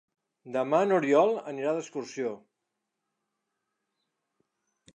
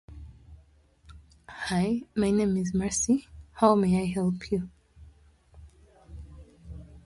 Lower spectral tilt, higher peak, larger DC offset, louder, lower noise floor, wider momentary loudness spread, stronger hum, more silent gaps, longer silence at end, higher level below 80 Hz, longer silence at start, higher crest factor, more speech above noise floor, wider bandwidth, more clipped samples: about the same, -5.5 dB/octave vs -5.5 dB/octave; about the same, -10 dBFS vs -8 dBFS; neither; about the same, -28 LUFS vs -27 LUFS; first, -84 dBFS vs -59 dBFS; second, 12 LU vs 25 LU; neither; neither; first, 2.6 s vs 0.05 s; second, -84 dBFS vs -50 dBFS; first, 0.45 s vs 0.1 s; about the same, 22 dB vs 22 dB; first, 57 dB vs 34 dB; second, 9.6 kHz vs 11.5 kHz; neither